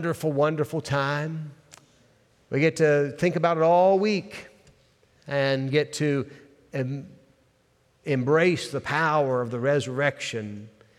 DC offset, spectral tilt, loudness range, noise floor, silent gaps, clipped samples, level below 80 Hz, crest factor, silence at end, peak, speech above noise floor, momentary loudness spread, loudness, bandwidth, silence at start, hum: under 0.1%; -6 dB/octave; 5 LU; -65 dBFS; none; under 0.1%; -68 dBFS; 18 dB; 0.3 s; -8 dBFS; 41 dB; 16 LU; -24 LUFS; 14.5 kHz; 0 s; none